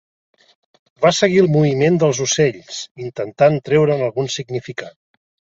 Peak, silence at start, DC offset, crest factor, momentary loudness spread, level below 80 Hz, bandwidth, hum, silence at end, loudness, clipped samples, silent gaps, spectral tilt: -2 dBFS; 1 s; under 0.1%; 16 dB; 15 LU; -58 dBFS; 8 kHz; none; 0.7 s; -17 LUFS; under 0.1%; 2.91-2.95 s; -5 dB/octave